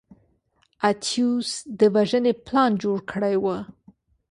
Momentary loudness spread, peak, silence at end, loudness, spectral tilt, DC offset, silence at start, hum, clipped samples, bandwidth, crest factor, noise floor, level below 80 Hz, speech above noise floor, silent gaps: 8 LU; -6 dBFS; 0.6 s; -23 LUFS; -5 dB/octave; under 0.1%; 0.8 s; none; under 0.1%; 11.5 kHz; 18 dB; -66 dBFS; -62 dBFS; 45 dB; none